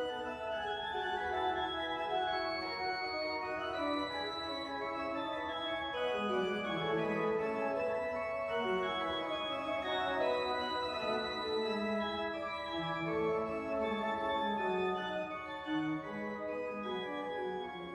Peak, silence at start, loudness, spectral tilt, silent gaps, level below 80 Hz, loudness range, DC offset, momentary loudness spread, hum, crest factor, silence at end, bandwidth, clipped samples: -22 dBFS; 0 s; -36 LUFS; -5.5 dB/octave; none; -66 dBFS; 2 LU; under 0.1%; 5 LU; none; 14 dB; 0 s; 12.5 kHz; under 0.1%